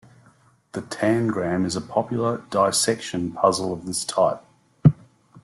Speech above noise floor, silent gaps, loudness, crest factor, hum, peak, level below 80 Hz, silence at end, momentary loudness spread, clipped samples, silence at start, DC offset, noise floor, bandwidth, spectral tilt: 34 dB; none; -23 LUFS; 22 dB; none; -2 dBFS; -54 dBFS; 0.05 s; 11 LU; under 0.1%; 0.75 s; under 0.1%; -57 dBFS; 12.5 kHz; -5 dB/octave